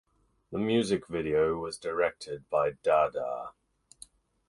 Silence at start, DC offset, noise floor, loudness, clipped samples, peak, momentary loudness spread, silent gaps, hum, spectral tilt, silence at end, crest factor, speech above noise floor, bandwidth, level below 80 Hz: 0.5 s; under 0.1%; -56 dBFS; -30 LUFS; under 0.1%; -12 dBFS; 12 LU; none; none; -5.5 dB/octave; 1 s; 18 dB; 27 dB; 11.5 kHz; -60 dBFS